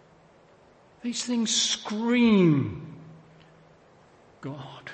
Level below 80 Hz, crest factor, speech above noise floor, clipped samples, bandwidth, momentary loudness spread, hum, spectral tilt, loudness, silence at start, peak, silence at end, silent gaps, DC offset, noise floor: -64 dBFS; 18 dB; 32 dB; under 0.1%; 8.8 kHz; 21 LU; none; -4.5 dB/octave; -24 LUFS; 1.05 s; -10 dBFS; 0 s; none; under 0.1%; -57 dBFS